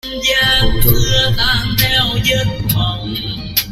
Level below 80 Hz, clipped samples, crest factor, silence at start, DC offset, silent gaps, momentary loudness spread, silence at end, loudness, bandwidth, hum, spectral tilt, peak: -22 dBFS; under 0.1%; 14 dB; 0.05 s; under 0.1%; none; 6 LU; 0 s; -14 LUFS; 16.5 kHz; none; -3.5 dB/octave; 0 dBFS